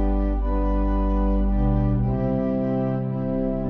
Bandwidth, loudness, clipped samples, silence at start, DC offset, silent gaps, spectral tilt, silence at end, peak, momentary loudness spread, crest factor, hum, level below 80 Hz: 3.4 kHz; -24 LUFS; under 0.1%; 0 s; under 0.1%; none; -11.5 dB/octave; 0 s; -10 dBFS; 3 LU; 12 dB; none; -24 dBFS